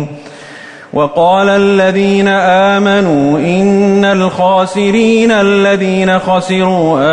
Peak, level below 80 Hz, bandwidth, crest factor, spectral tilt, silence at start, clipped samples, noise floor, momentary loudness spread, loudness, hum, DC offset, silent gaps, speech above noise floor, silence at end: 0 dBFS; -46 dBFS; 10 kHz; 10 dB; -6 dB/octave; 0 s; under 0.1%; -31 dBFS; 8 LU; -10 LUFS; none; under 0.1%; none; 22 dB; 0 s